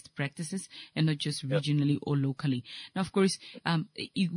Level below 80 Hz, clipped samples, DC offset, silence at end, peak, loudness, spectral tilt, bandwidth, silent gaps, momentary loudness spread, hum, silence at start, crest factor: -70 dBFS; under 0.1%; under 0.1%; 0 s; -14 dBFS; -31 LUFS; -6 dB/octave; 11 kHz; none; 9 LU; none; 0.15 s; 18 dB